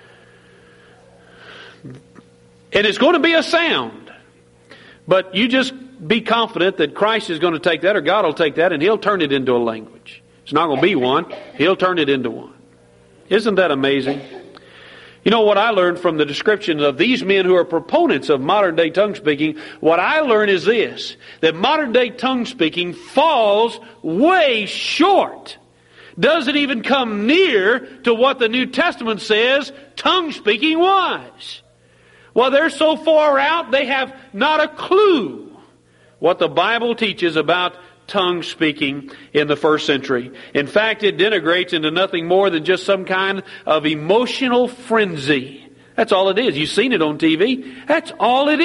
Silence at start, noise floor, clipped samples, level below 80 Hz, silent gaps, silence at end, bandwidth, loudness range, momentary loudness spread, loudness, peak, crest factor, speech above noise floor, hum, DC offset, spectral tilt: 1.45 s; -52 dBFS; under 0.1%; -60 dBFS; none; 0 s; 11.5 kHz; 3 LU; 8 LU; -17 LUFS; -2 dBFS; 16 dB; 35 dB; none; under 0.1%; -5 dB/octave